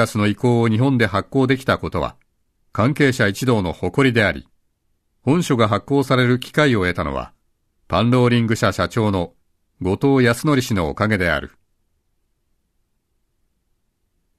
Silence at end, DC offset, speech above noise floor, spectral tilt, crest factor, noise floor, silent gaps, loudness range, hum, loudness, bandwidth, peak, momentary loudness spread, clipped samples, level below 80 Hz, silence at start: 2.9 s; under 0.1%; 51 dB; -6 dB/octave; 16 dB; -68 dBFS; none; 3 LU; none; -18 LUFS; 14 kHz; -2 dBFS; 9 LU; under 0.1%; -44 dBFS; 0 s